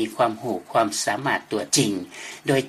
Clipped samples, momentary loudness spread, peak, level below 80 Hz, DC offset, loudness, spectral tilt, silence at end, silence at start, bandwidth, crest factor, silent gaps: under 0.1%; 10 LU; -6 dBFS; -64 dBFS; under 0.1%; -23 LUFS; -3.5 dB/octave; 0 s; 0 s; 15 kHz; 18 dB; none